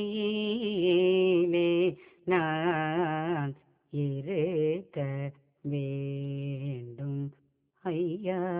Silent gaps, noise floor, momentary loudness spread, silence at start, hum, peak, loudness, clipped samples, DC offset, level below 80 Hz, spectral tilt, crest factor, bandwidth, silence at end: none; -69 dBFS; 13 LU; 0 s; none; -12 dBFS; -30 LUFS; under 0.1%; under 0.1%; -72 dBFS; -5.5 dB/octave; 18 dB; 4 kHz; 0 s